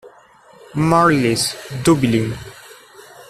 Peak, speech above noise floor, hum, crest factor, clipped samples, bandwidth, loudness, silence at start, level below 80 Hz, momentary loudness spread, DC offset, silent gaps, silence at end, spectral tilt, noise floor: -2 dBFS; 31 dB; none; 16 dB; under 0.1%; 14 kHz; -17 LUFS; 0.05 s; -46 dBFS; 16 LU; under 0.1%; none; 0.05 s; -5 dB/octave; -47 dBFS